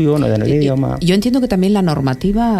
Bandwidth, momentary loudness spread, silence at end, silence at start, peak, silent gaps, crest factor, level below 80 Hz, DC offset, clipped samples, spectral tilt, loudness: 14.5 kHz; 2 LU; 0 s; 0 s; -2 dBFS; none; 12 dB; -32 dBFS; under 0.1%; under 0.1%; -7.5 dB/octave; -15 LUFS